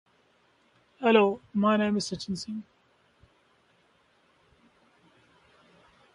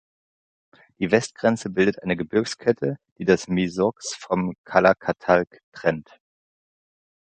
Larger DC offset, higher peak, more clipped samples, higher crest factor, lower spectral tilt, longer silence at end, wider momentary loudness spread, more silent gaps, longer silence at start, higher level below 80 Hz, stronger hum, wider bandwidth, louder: neither; second, -8 dBFS vs -2 dBFS; neither; about the same, 24 dB vs 22 dB; about the same, -5.5 dB/octave vs -5.5 dB/octave; first, 3.55 s vs 1.3 s; first, 14 LU vs 8 LU; second, none vs 3.11-3.16 s, 4.58-4.64 s, 5.63-5.72 s; about the same, 1 s vs 1 s; second, -68 dBFS vs -56 dBFS; neither; first, 11 kHz vs 9.4 kHz; second, -27 LUFS vs -23 LUFS